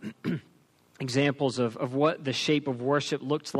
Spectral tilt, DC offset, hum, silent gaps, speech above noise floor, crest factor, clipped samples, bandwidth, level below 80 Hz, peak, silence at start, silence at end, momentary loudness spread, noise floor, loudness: -5.5 dB/octave; under 0.1%; none; none; 35 dB; 18 dB; under 0.1%; 13 kHz; -72 dBFS; -12 dBFS; 0 s; 0 s; 8 LU; -62 dBFS; -28 LUFS